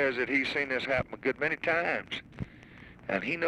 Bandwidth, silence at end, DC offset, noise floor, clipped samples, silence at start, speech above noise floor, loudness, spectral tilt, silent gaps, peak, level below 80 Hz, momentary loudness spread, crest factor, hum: 11.5 kHz; 0 s; under 0.1%; -51 dBFS; under 0.1%; 0 s; 21 dB; -30 LUFS; -5.5 dB/octave; none; -16 dBFS; -56 dBFS; 16 LU; 16 dB; none